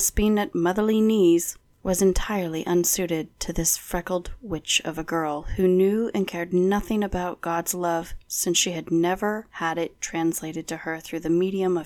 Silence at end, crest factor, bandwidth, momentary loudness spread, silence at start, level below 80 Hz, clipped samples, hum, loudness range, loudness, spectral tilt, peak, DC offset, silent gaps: 0 s; 18 dB; 19 kHz; 10 LU; 0 s; -40 dBFS; under 0.1%; none; 3 LU; -24 LUFS; -4 dB/octave; -6 dBFS; under 0.1%; none